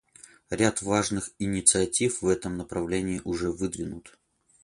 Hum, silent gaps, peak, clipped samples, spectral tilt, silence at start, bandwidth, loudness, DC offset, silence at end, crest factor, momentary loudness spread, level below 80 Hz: none; none; -4 dBFS; under 0.1%; -4 dB/octave; 0.5 s; 11.5 kHz; -26 LUFS; under 0.1%; 0.55 s; 24 dB; 12 LU; -50 dBFS